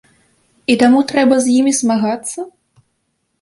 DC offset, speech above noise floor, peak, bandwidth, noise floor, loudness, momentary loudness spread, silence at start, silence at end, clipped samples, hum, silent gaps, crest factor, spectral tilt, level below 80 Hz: under 0.1%; 55 dB; -2 dBFS; 11.5 kHz; -68 dBFS; -14 LUFS; 14 LU; 0.7 s; 0.9 s; under 0.1%; none; none; 14 dB; -3.5 dB/octave; -58 dBFS